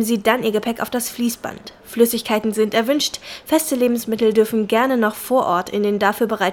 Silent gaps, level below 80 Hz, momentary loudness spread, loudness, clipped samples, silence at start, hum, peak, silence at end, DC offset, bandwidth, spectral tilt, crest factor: none; -56 dBFS; 6 LU; -19 LUFS; under 0.1%; 0 s; none; -2 dBFS; 0 s; under 0.1%; 19.5 kHz; -4 dB/octave; 16 dB